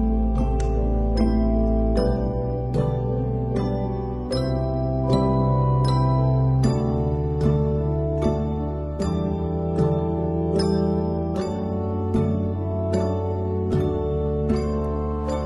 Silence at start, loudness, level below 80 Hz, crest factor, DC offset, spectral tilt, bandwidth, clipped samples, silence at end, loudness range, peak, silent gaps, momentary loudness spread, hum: 0 s; -23 LUFS; -28 dBFS; 16 dB; under 0.1%; -9 dB/octave; 11 kHz; under 0.1%; 0 s; 3 LU; -6 dBFS; none; 6 LU; none